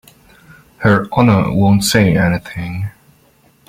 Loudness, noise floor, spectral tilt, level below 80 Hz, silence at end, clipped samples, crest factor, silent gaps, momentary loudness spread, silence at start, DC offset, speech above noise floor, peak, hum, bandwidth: -14 LUFS; -52 dBFS; -5.5 dB/octave; -40 dBFS; 0.8 s; under 0.1%; 14 dB; none; 13 LU; 0.8 s; under 0.1%; 39 dB; 0 dBFS; none; 16 kHz